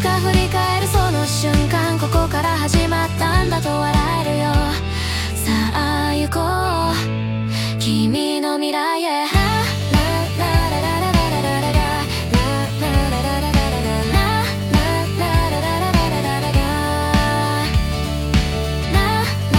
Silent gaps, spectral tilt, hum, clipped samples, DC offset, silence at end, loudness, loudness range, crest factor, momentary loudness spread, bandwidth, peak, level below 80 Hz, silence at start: none; -5 dB/octave; none; under 0.1%; under 0.1%; 0 s; -18 LUFS; 1 LU; 16 dB; 3 LU; 17.5 kHz; -2 dBFS; -26 dBFS; 0 s